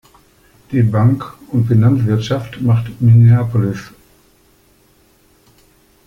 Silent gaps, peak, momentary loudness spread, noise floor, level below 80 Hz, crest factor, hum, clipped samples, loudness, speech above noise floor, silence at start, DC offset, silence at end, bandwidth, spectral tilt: none; -2 dBFS; 12 LU; -52 dBFS; -46 dBFS; 14 dB; none; under 0.1%; -14 LUFS; 40 dB; 0.7 s; under 0.1%; 2.2 s; 6.6 kHz; -9 dB/octave